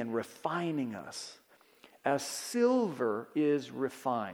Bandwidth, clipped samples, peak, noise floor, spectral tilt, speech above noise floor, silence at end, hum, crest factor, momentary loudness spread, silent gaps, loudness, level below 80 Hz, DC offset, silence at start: 19 kHz; under 0.1%; -14 dBFS; -61 dBFS; -5 dB/octave; 29 dB; 0 s; none; 18 dB; 12 LU; none; -33 LUFS; -84 dBFS; under 0.1%; 0 s